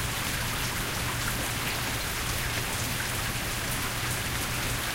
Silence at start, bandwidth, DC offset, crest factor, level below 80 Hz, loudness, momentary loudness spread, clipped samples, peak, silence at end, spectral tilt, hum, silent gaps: 0 s; 16 kHz; 0.1%; 14 dB; -40 dBFS; -29 LUFS; 1 LU; under 0.1%; -16 dBFS; 0 s; -2.5 dB/octave; none; none